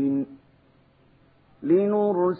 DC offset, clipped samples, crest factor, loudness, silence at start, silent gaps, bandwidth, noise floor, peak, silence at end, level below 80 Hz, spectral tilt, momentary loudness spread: under 0.1%; under 0.1%; 16 dB; -23 LUFS; 0 s; none; 4 kHz; -59 dBFS; -10 dBFS; 0 s; -68 dBFS; -13 dB/octave; 15 LU